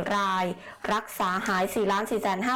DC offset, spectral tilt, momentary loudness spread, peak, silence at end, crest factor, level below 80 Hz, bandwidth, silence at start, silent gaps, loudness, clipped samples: under 0.1%; -4.5 dB/octave; 4 LU; -20 dBFS; 0 s; 6 dB; -58 dBFS; 19 kHz; 0 s; none; -27 LUFS; under 0.1%